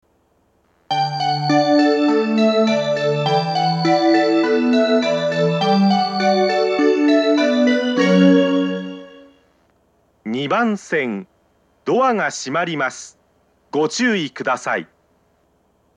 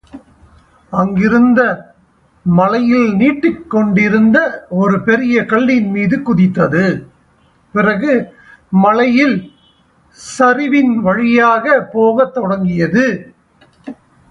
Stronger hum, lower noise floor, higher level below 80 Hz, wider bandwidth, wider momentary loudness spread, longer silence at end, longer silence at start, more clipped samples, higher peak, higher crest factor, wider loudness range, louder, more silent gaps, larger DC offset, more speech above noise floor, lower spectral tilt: neither; first, -61 dBFS vs -52 dBFS; second, -70 dBFS vs -48 dBFS; about the same, 9.6 kHz vs 10.5 kHz; about the same, 9 LU vs 11 LU; first, 1.1 s vs 0.4 s; first, 0.9 s vs 0.15 s; neither; about the same, 0 dBFS vs 0 dBFS; first, 18 dB vs 12 dB; first, 7 LU vs 2 LU; second, -17 LUFS vs -13 LUFS; neither; neither; about the same, 41 dB vs 40 dB; second, -5.5 dB/octave vs -7.5 dB/octave